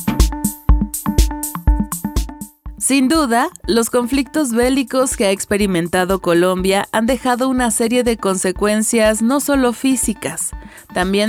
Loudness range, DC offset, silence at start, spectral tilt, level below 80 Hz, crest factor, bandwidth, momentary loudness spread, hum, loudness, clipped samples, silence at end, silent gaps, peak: 2 LU; under 0.1%; 0 s; -4.5 dB/octave; -24 dBFS; 16 dB; 18 kHz; 7 LU; none; -17 LUFS; under 0.1%; 0 s; none; 0 dBFS